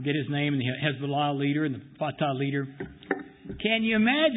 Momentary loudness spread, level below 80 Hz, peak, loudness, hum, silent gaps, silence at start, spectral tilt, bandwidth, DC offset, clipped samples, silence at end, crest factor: 11 LU; -58 dBFS; -10 dBFS; -28 LUFS; none; none; 0 s; -10.5 dB/octave; 4 kHz; under 0.1%; under 0.1%; 0 s; 18 dB